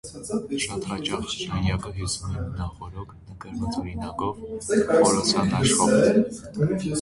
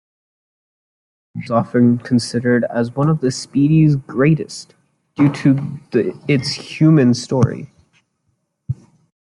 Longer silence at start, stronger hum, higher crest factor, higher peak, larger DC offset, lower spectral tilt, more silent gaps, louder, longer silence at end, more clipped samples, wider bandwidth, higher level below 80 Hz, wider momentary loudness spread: second, 0.05 s vs 1.35 s; neither; about the same, 18 dB vs 16 dB; second, -6 dBFS vs -2 dBFS; neither; second, -4.5 dB/octave vs -7 dB/octave; neither; second, -24 LUFS vs -16 LUFS; second, 0 s vs 0.5 s; neither; about the same, 11.5 kHz vs 11.5 kHz; first, -42 dBFS vs -52 dBFS; about the same, 15 LU vs 16 LU